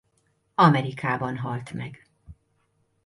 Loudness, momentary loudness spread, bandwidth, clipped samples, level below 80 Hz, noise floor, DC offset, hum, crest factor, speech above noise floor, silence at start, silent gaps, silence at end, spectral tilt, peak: -24 LUFS; 17 LU; 11.5 kHz; under 0.1%; -60 dBFS; -70 dBFS; under 0.1%; none; 20 dB; 46 dB; 0.6 s; none; 0.7 s; -7.5 dB/octave; -6 dBFS